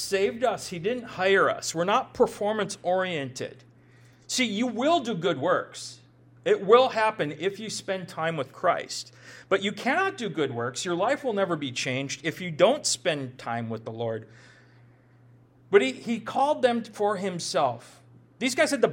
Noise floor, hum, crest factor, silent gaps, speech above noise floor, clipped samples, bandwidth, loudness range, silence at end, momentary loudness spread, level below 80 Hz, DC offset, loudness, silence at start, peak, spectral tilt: -56 dBFS; none; 22 dB; none; 30 dB; under 0.1%; 16.5 kHz; 4 LU; 0 s; 10 LU; -68 dBFS; under 0.1%; -26 LUFS; 0 s; -4 dBFS; -4 dB/octave